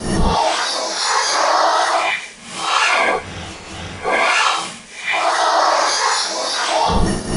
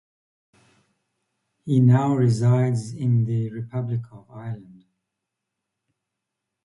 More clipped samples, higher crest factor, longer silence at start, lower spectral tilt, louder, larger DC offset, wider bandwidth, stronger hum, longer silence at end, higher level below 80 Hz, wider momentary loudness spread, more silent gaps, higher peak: neither; about the same, 14 dB vs 18 dB; second, 0 s vs 1.65 s; second, -2.5 dB/octave vs -8.5 dB/octave; first, -16 LUFS vs -22 LUFS; neither; about the same, 11 kHz vs 11 kHz; neither; second, 0 s vs 2.05 s; first, -30 dBFS vs -60 dBFS; second, 12 LU vs 20 LU; neither; about the same, -4 dBFS vs -6 dBFS